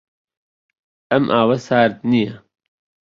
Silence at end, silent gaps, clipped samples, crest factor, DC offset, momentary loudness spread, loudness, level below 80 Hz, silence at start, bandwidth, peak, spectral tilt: 0.7 s; none; under 0.1%; 18 dB; under 0.1%; 4 LU; -17 LUFS; -58 dBFS; 1.1 s; 7.4 kHz; -2 dBFS; -7 dB/octave